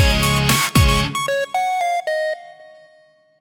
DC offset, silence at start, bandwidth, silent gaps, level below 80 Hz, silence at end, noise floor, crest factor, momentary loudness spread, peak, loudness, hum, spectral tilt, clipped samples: under 0.1%; 0 s; 17.5 kHz; none; -26 dBFS; 0.75 s; -53 dBFS; 16 dB; 8 LU; -2 dBFS; -18 LUFS; none; -4 dB/octave; under 0.1%